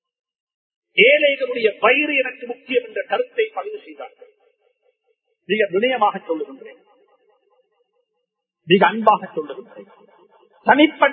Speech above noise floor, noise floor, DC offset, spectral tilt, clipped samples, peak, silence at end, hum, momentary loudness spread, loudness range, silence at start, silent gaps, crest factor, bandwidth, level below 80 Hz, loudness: 57 dB; -77 dBFS; under 0.1%; -8 dB/octave; under 0.1%; 0 dBFS; 0 s; none; 20 LU; 7 LU; 0.95 s; none; 20 dB; 4.4 kHz; -74 dBFS; -18 LUFS